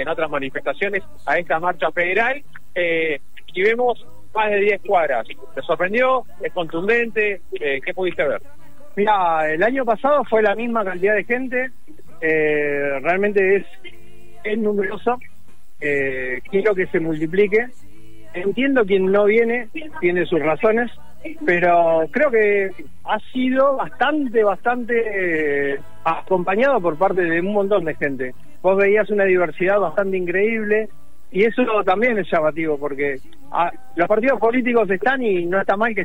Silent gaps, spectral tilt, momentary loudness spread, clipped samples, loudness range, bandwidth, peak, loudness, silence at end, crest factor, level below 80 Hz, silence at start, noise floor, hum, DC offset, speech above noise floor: none; -7 dB/octave; 9 LU; under 0.1%; 3 LU; 16 kHz; -6 dBFS; -19 LUFS; 0 s; 14 dB; -54 dBFS; 0 s; -53 dBFS; none; 4%; 34 dB